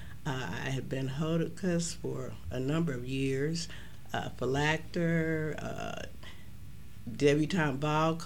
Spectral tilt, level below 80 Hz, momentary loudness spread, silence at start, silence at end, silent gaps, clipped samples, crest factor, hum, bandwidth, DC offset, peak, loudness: -5.5 dB/octave; -52 dBFS; 17 LU; 0 s; 0 s; none; under 0.1%; 20 dB; none; 16.5 kHz; 0.8%; -14 dBFS; -33 LUFS